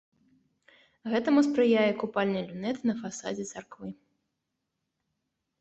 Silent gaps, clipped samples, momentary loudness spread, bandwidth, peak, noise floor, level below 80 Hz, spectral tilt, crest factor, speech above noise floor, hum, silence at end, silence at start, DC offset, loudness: none; under 0.1%; 19 LU; 8.2 kHz; -12 dBFS; -83 dBFS; -72 dBFS; -5.5 dB/octave; 18 dB; 55 dB; none; 1.7 s; 1.05 s; under 0.1%; -28 LUFS